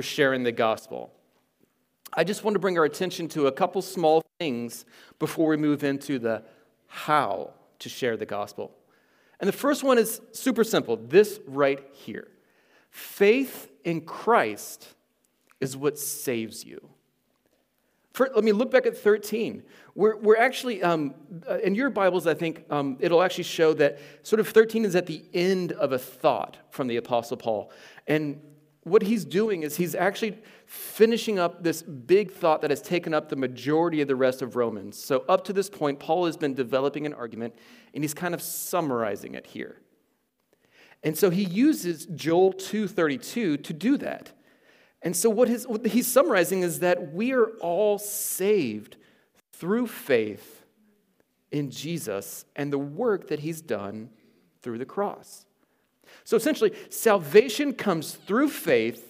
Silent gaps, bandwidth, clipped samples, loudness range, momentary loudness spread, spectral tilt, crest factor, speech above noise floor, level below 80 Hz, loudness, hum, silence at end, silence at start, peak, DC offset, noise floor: none; 16 kHz; under 0.1%; 7 LU; 15 LU; -4.5 dB/octave; 22 dB; 47 dB; -80 dBFS; -25 LUFS; none; 0.05 s; 0 s; -4 dBFS; under 0.1%; -73 dBFS